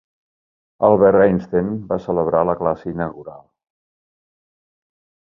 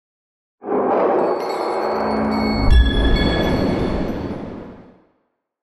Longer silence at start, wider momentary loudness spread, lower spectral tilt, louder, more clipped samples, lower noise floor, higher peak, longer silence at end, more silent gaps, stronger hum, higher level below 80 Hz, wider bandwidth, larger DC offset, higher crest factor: first, 0.8 s vs 0.65 s; about the same, 13 LU vs 14 LU; first, -10.5 dB/octave vs -7 dB/octave; about the same, -18 LUFS vs -19 LUFS; neither; first, under -90 dBFS vs -69 dBFS; first, 0 dBFS vs -4 dBFS; first, 1.9 s vs 0.8 s; neither; neither; second, -50 dBFS vs -24 dBFS; second, 5.8 kHz vs 12 kHz; neither; about the same, 20 dB vs 16 dB